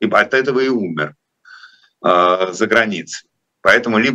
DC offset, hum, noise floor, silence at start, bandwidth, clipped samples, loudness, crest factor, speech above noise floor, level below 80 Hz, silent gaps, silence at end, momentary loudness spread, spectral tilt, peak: under 0.1%; none; -44 dBFS; 0 s; 12.5 kHz; under 0.1%; -15 LUFS; 16 dB; 29 dB; -60 dBFS; none; 0 s; 13 LU; -4.5 dB/octave; 0 dBFS